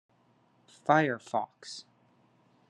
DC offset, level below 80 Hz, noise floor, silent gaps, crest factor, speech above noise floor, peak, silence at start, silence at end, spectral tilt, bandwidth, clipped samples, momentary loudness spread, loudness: under 0.1%; -84 dBFS; -67 dBFS; none; 24 dB; 38 dB; -8 dBFS; 0.85 s; 0.9 s; -5.5 dB/octave; 11 kHz; under 0.1%; 18 LU; -30 LUFS